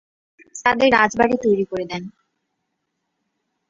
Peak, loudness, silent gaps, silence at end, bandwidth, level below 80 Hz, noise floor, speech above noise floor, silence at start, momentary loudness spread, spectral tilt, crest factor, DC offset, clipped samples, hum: 0 dBFS; -18 LUFS; none; 1.6 s; 7.8 kHz; -56 dBFS; -76 dBFS; 57 dB; 0.55 s; 18 LU; -4.5 dB/octave; 22 dB; under 0.1%; under 0.1%; none